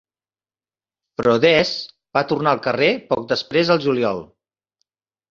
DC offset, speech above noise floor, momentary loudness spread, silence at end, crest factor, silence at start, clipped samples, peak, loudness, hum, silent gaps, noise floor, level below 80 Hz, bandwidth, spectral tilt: under 0.1%; over 72 dB; 9 LU; 1.05 s; 20 dB; 1.2 s; under 0.1%; -2 dBFS; -19 LUFS; none; none; under -90 dBFS; -58 dBFS; 7.4 kHz; -5.5 dB/octave